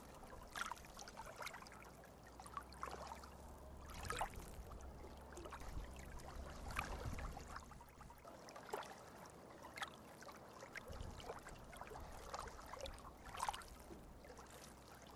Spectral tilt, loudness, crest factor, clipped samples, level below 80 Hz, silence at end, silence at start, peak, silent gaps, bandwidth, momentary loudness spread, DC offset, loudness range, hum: -3.5 dB/octave; -53 LUFS; 28 dB; under 0.1%; -58 dBFS; 0 s; 0 s; -24 dBFS; none; over 20 kHz; 11 LU; under 0.1%; 3 LU; none